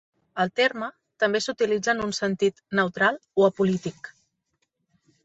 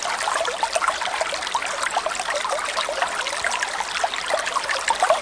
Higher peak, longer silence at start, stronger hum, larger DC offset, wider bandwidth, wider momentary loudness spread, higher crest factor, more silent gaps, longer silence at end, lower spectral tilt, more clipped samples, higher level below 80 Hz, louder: about the same, -6 dBFS vs -4 dBFS; first, 0.35 s vs 0 s; neither; neither; second, 8.2 kHz vs 10.5 kHz; first, 14 LU vs 2 LU; about the same, 20 dB vs 20 dB; neither; first, 1.15 s vs 0 s; first, -4.5 dB/octave vs 0.5 dB/octave; neither; second, -64 dBFS vs -56 dBFS; about the same, -24 LUFS vs -23 LUFS